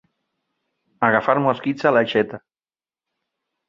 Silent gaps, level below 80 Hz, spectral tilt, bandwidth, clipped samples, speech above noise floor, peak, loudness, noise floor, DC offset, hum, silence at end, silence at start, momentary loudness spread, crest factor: none; -64 dBFS; -7 dB/octave; 7.4 kHz; under 0.1%; over 71 dB; 0 dBFS; -19 LUFS; under -90 dBFS; under 0.1%; none; 1.3 s; 1 s; 7 LU; 22 dB